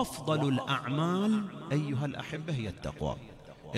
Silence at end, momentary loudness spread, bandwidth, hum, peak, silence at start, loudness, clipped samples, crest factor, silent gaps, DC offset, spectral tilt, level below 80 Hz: 0 s; 9 LU; 14 kHz; none; -16 dBFS; 0 s; -32 LUFS; under 0.1%; 16 dB; none; under 0.1%; -6.5 dB/octave; -54 dBFS